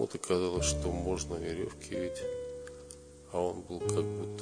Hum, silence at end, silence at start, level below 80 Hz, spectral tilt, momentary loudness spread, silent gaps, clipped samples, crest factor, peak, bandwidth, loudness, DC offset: none; 0 s; 0 s; -46 dBFS; -4.5 dB/octave; 14 LU; none; under 0.1%; 22 dB; -14 dBFS; 10 kHz; -35 LUFS; under 0.1%